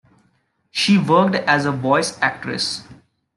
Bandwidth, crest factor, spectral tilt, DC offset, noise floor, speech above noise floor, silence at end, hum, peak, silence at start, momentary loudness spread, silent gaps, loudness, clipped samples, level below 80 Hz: 12 kHz; 18 dB; -4.5 dB/octave; under 0.1%; -64 dBFS; 46 dB; 0.45 s; none; -2 dBFS; 0.75 s; 9 LU; none; -18 LUFS; under 0.1%; -64 dBFS